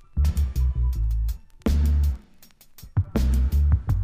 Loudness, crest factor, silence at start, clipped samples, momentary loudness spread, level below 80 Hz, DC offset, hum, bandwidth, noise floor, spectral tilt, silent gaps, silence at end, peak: -25 LUFS; 12 dB; 0.15 s; under 0.1%; 8 LU; -24 dBFS; under 0.1%; none; 15.5 kHz; -51 dBFS; -7.5 dB/octave; none; 0 s; -10 dBFS